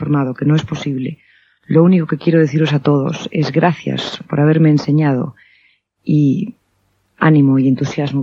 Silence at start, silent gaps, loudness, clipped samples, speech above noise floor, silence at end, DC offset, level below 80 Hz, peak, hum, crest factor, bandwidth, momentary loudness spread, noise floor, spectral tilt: 0 s; none; -15 LUFS; under 0.1%; 48 dB; 0 s; under 0.1%; -56 dBFS; 0 dBFS; none; 14 dB; 7.2 kHz; 10 LU; -62 dBFS; -8 dB/octave